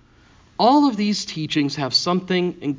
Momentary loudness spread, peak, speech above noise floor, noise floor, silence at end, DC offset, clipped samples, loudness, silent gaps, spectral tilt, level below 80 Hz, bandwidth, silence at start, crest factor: 8 LU; -4 dBFS; 33 dB; -52 dBFS; 0 s; under 0.1%; under 0.1%; -20 LUFS; none; -5 dB/octave; -58 dBFS; 7.6 kHz; 0.6 s; 18 dB